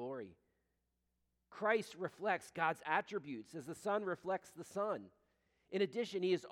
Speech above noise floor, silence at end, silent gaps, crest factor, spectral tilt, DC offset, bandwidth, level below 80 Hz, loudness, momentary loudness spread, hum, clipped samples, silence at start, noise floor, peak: 45 dB; 0 s; none; 22 dB; -5 dB/octave; under 0.1%; 15.5 kHz; -84 dBFS; -40 LUFS; 12 LU; none; under 0.1%; 0 s; -85 dBFS; -20 dBFS